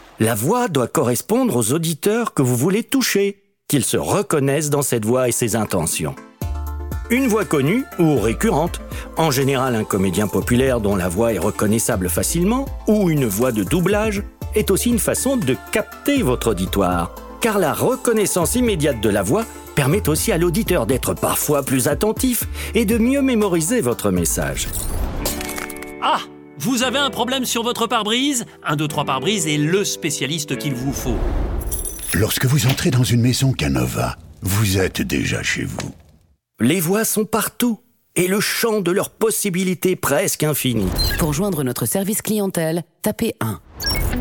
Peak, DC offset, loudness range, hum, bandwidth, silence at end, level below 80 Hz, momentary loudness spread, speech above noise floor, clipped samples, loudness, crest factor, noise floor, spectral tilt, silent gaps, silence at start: -4 dBFS; under 0.1%; 2 LU; none; 18 kHz; 0 s; -34 dBFS; 6 LU; 36 dB; under 0.1%; -19 LUFS; 14 dB; -55 dBFS; -4.5 dB/octave; none; 0.2 s